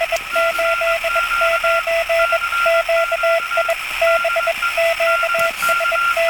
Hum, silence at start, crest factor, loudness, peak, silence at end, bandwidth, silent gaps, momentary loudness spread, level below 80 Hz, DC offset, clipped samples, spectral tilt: none; 0 s; 12 dB; -16 LUFS; -6 dBFS; 0 s; 17.5 kHz; none; 2 LU; -46 dBFS; under 0.1%; under 0.1%; 0 dB/octave